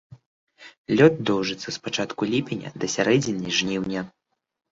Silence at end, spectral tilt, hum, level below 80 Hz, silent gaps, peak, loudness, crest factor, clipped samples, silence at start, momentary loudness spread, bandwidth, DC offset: 0.6 s; -4.5 dB/octave; none; -60 dBFS; 0.26-0.47 s, 0.78-0.85 s; -2 dBFS; -23 LUFS; 22 dB; under 0.1%; 0.1 s; 13 LU; 7.8 kHz; under 0.1%